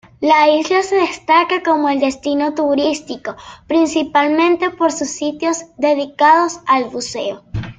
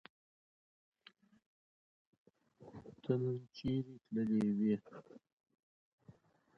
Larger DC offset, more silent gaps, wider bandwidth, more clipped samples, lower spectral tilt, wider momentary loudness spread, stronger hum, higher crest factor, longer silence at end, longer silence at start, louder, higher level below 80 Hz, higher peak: neither; second, none vs 5.32-5.37 s, 5.63-5.98 s; first, 9.4 kHz vs 6.4 kHz; neither; second, -4 dB/octave vs -8.5 dB/octave; second, 11 LU vs 22 LU; neither; second, 14 dB vs 22 dB; second, 0.05 s vs 0.45 s; second, 0.2 s vs 2.6 s; first, -15 LUFS vs -38 LUFS; first, -46 dBFS vs -70 dBFS; first, 0 dBFS vs -20 dBFS